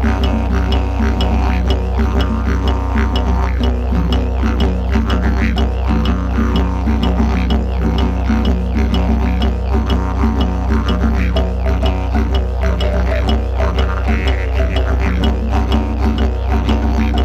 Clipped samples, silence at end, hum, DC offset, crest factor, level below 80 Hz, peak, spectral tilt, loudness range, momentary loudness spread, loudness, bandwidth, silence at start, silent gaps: under 0.1%; 0 s; none; under 0.1%; 14 dB; -16 dBFS; 0 dBFS; -7.5 dB/octave; 1 LU; 2 LU; -16 LUFS; 6.8 kHz; 0 s; none